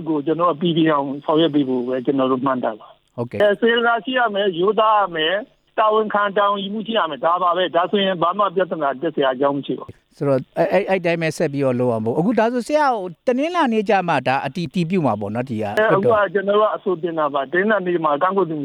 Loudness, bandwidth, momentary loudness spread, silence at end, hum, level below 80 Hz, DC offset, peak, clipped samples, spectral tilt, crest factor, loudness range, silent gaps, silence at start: -19 LUFS; 13.5 kHz; 6 LU; 0 s; none; -62 dBFS; under 0.1%; -2 dBFS; under 0.1%; -6.5 dB/octave; 16 dB; 2 LU; none; 0 s